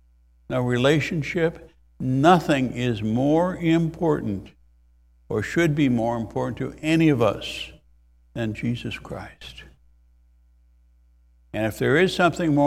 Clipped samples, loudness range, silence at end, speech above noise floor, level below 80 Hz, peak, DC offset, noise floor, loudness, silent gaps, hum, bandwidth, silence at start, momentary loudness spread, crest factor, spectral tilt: under 0.1%; 12 LU; 0 s; 35 dB; -50 dBFS; -4 dBFS; under 0.1%; -57 dBFS; -23 LUFS; none; none; 15 kHz; 0.5 s; 15 LU; 20 dB; -6.5 dB/octave